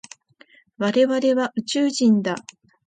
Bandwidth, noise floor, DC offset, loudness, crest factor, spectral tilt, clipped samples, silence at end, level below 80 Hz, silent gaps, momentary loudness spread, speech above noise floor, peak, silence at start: 9.4 kHz; -54 dBFS; under 0.1%; -21 LUFS; 14 dB; -5 dB/octave; under 0.1%; 0.45 s; -70 dBFS; none; 8 LU; 34 dB; -8 dBFS; 0.8 s